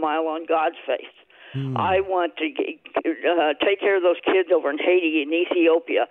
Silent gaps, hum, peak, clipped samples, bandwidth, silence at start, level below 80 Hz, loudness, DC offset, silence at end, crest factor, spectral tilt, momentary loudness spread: none; none; -8 dBFS; under 0.1%; 4 kHz; 0 s; -62 dBFS; -22 LUFS; under 0.1%; 0.05 s; 14 dB; -8.5 dB/octave; 9 LU